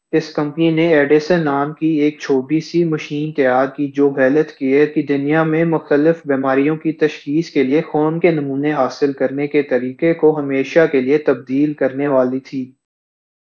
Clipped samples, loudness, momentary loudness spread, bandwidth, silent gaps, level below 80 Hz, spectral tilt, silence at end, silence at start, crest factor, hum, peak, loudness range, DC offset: under 0.1%; -16 LUFS; 6 LU; 7 kHz; none; -68 dBFS; -7.5 dB/octave; 0.8 s; 0.15 s; 16 dB; none; 0 dBFS; 1 LU; under 0.1%